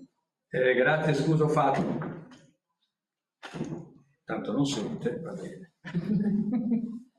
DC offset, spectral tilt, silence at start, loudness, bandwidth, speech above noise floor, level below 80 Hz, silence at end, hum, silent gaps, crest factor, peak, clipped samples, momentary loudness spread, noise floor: under 0.1%; -6.5 dB/octave; 0 s; -28 LUFS; 11.5 kHz; 63 dB; -66 dBFS; 0.15 s; none; none; 18 dB; -10 dBFS; under 0.1%; 19 LU; -90 dBFS